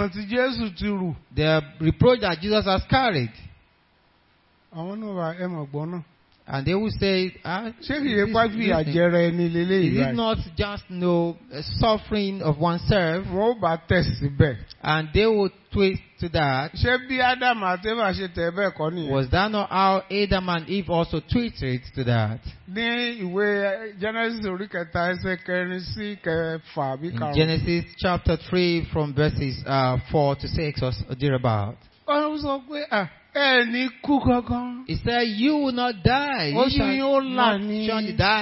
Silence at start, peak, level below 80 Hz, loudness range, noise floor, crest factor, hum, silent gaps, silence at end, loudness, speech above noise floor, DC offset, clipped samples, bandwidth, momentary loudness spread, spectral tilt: 0 s; -4 dBFS; -42 dBFS; 4 LU; -62 dBFS; 20 dB; none; none; 0 s; -24 LUFS; 38 dB; under 0.1%; under 0.1%; 5.8 kHz; 9 LU; -10 dB/octave